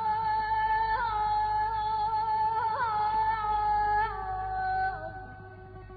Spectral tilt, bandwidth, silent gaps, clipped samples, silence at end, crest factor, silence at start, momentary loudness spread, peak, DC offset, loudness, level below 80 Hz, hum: -2 dB/octave; 4.9 kHz; none; under 0.1%; 0 s; 10 dB; 0 s; 13 LU; -18 dBFS; under 0.1%; -29 LUFS; -48 dBFS; none